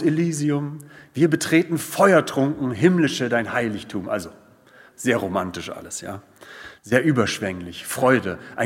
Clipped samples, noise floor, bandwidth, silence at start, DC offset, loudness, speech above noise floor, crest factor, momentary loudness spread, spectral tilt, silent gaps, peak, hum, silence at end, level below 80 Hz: under 0.1%; -51 dBFS; 16.5 kHz; 0 s; under 0.1%; -22 LUFS; 29 dB; 22 dB; 16 LU; -5.5 dB/octave; none; 0 dBFS; none; 0 s; -64 dBFS